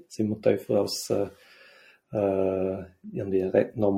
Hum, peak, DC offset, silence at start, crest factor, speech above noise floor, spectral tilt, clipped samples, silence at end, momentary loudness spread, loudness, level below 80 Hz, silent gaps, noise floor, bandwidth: none; -6 dBFS; under 0.1%; 0.1 s; 20 dB; 29 dB; -6 dB/octave; under 0.1%; 0 s; 11 LU; -27 LUFS; -64 dBFS; none; -55 dBFS; 16.5 kHz